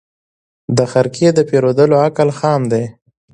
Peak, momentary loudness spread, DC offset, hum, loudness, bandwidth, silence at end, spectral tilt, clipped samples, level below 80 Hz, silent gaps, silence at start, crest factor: 0 dBFS; 8 LU; under 0.1%; none; -14 LUFS; 10.5 kHz; 0.4 s; -6.5 dB/octave; under 0.1%; -54 dBFS; none; 0.7 s; 14 dB